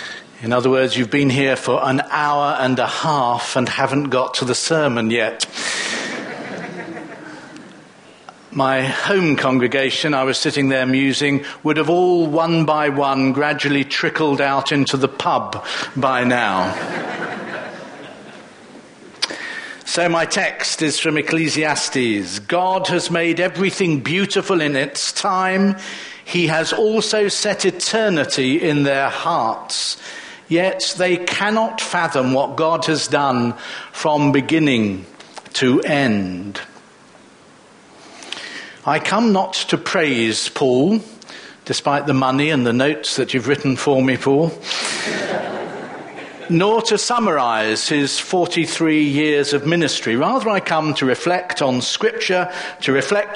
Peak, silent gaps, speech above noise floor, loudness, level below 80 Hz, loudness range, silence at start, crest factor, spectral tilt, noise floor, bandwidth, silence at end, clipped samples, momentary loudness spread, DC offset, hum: -2 dBFS; none; 29 dB; -18 LUFS; -62 dBFS; 5 LU; 0 s; 18 dB; -4 dB/octave; -46 dBFS; 10.5 kHz; 0 s; under 0.1%; 13 LU; under 0.1%; none